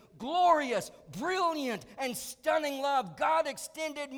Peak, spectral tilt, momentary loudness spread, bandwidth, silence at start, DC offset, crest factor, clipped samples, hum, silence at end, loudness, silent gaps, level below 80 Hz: -14 dBFS; -3 dB/octave; 11 LU; over 20 kHz; 0.15 s; under 0.1%; 18 dB; under 0.1%; none; 0 s; -31 LUFS; none; -70 dBFS